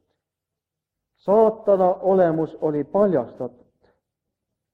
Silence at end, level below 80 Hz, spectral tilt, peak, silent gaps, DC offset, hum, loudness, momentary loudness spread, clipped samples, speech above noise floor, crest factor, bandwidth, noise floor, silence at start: 1.25 s; -64 dBFS; -10 dB/octave; -6 dBFS; none; under 0.1%; none; -20 LUFS; 15 LU; under 0.1%; 66 dB; 16 dB; 4.7 kHz; -85 dBFS; 1.25 s